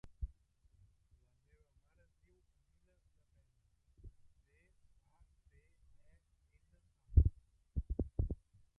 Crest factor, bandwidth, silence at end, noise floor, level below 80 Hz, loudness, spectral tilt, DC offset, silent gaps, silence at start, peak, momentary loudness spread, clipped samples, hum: 28 dB; 2.1 kHz; 0.45 s; -75 dBFS; -44 dBFS; -38 LUFS; -11.5 dB/octave; under 0.1%; none; 0.2 s; -14 dBFS; 18 LU; under 0.1%; none